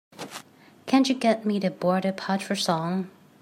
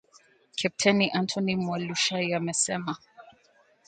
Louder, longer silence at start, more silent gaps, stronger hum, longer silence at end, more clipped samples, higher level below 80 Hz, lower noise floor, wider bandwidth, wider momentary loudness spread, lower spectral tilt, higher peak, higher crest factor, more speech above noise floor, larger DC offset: about the same, -25 LUFS vs -27 LUFS; second, 0.2 s vs 0.55 s; neither; neither; second, 0.3 s vs 0.6 s; neither; second, -76 dBFS vs -68 dBFS; second, -50 dBFS vs -63 dBFS; first, 16 kHz vs 9.4 kHz; first, 17 LU vs 11 LU; first, -5 dB/octave vs -3.5 dB/octave; about the same, -8 dBFS vs -6 dBFS; about the same, 18 dB vs 22 dB; second, 26 dB vs 36 dB; neither